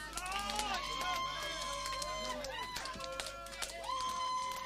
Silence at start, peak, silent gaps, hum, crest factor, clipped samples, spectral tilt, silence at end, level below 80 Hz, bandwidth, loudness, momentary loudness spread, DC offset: 0 s; -18 dBFS; none; 50 Hz at -55 dBFS; 22 dB; under 0.1%; -1 dB/octave; 0 s; -56 dBFS; 15.5 kHz; -39 LUFS; 5 LU; under 0.1%